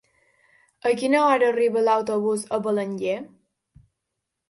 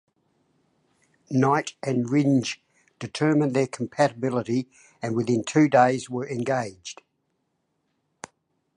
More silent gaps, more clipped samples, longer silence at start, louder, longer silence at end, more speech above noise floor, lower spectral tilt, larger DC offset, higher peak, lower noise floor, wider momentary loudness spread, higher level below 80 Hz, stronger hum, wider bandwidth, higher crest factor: neither; neither; second, 0.85 s vs 1.3 s; about the same, -22 LUFS vs -24 LUFS; second, 1.25 s vs 1.85 s; first, 60 dB vs 51 dB; about the same, -5 dB/octave vs -6 dB/octave; neither; about the same, -6 dBFS vs -6 dBFS; first, -82 dBFS vs -75 dBFS; second, 9 LU vs 20 LU; about the same, -68 dBFS vs -70 dBFS; neither; about the same, 11.5 kHz vs 10.5 kHz; about the same, 18 dB vs 20 dB